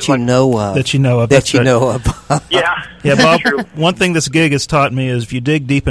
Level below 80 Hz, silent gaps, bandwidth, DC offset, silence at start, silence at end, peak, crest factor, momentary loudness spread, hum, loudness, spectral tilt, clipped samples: -34 dBFS; none; 11 kHz; 0.2%; 0 s; 0 s; 0 dBFS; 12 dB; 7 LU; none; -13 LUFS; -5 dB/octave; under 0.1%